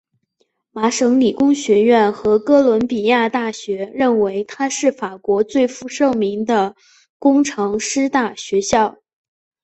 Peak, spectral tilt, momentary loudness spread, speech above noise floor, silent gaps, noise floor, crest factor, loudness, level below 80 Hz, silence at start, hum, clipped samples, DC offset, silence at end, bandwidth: -2 dBFS; -4 dB/octave; 8 LU; 51 dB; 7.10-7.20 s; -67 dBFS; 14 dB; -17 LUFS; -54 dBFS; 0.75 s; none; under 0.1%; under 0.1%; 0.75 s; 8.4 kHz